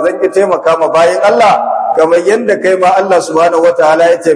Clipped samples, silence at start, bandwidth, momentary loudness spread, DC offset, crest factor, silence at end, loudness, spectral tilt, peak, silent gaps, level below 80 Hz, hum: 1%; 0 s; 11 kHz; 3 LU; under 0.1%; 8 dB; 0 s; -9 LUFS; -4.5 dB/octave; 0 dBFS; none; -56 dBFS; none